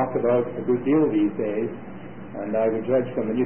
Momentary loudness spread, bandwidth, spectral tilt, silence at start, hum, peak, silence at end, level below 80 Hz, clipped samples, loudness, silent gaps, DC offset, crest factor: 17 LU; 3.3 kHz; -12.5 dB/octave; 0 s; none; -10 dBFS; 0 s; -58 dBFS; under 0.1%; -23 LUFS; none; 0.7%; 14 dB